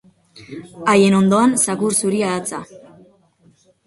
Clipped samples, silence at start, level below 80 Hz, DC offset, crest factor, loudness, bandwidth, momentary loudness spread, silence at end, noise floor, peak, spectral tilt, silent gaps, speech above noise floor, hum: under 0.1%; 0.35 s; -60 dBFS; under 0.1%; 16 dB; -16 LUFS; 11.5 kHz; 21 LU; 1.25 s; -55 dBFS; -2 dBFS; -4.5 dB/octave; none; 38 dB; none